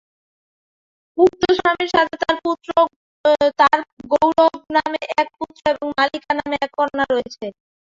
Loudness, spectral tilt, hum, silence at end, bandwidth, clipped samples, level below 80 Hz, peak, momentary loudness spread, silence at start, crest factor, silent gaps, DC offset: -18 LUFS; -4.5 dB/octave; none; 0.3 s; 7.8 kHz; under 0.1%; -54 dBFS; -2 dBFS; 8 LU; 1.15 s; 16 dB; 2.96-3.24 s, 3.92-3.97 s; under 0.1%